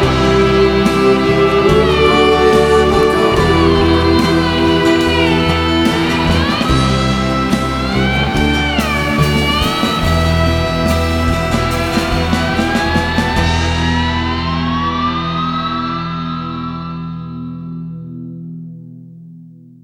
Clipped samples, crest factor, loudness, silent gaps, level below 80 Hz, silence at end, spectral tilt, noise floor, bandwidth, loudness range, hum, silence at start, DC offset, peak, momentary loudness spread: under 0.1%; 14 dB; -13 LUFS; none; -24 dBFS; 0.3 s; -5.5 dB/octave; -38 dBFS; 19.5 kHz; 10 LU; none; 0 s; under 0.1%; 0 dBFS; 14 LU